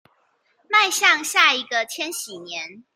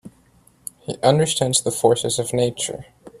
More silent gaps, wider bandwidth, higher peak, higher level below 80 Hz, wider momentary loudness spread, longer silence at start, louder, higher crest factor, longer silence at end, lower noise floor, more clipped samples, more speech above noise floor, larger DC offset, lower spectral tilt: neither; about the same, 16.5 kHz vs 15 kHz; about the same, -2 dBFS vs -2 dBFS; second, -82 dBFS vs -54 dBFS; second, 15 LU vs 18 LU; first, 0.7 s vs 0.05 s; about the same, -18 LUFS vs -19 LUFS; about the same, 22 dB vs 20 dB; about the same, 0.15 s vs 0.05 s; first, -65 dBFS vs -55 dBFS; neither; first, 43 dB vs 36 dB; neither; second, 1 dB/octave vs -4 dB/octave